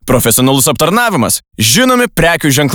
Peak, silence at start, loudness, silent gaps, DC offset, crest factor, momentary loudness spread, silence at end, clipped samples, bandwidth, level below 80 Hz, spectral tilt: 0 dBFS; 0.05 s; -9 LUFS; none; under 0.1%; 10 dB; 3 LU; 0 s; under 0.1%; over 20 kHz; -34 dBFS; -3.5 dB/octave